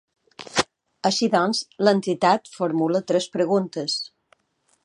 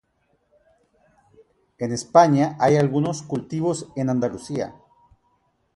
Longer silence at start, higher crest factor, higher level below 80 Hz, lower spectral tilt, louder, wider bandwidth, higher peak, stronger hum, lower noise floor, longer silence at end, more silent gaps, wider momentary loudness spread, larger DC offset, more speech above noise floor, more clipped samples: second, 0.4 s vs 1.8 s; about the same, 20 dB vs 22 dB; about the same, -64 dBFS vs -62 dBFS; second, -4.5 dB/octave vs -6.5 dB/octave; about the same, -23 LUFS vs -21 LUFS; about the same, 11.5 kHz vs 11.5 kHz; about the same, -2 dBFS vs -2 dBFS; neither; about the same, -68 dBFS vs -68 dBFS; second, 0.75 s vs 1.05 s; neither; second, 7 LU vs 13 LU; neither; about the same, 46 dB vs 47 dB; neither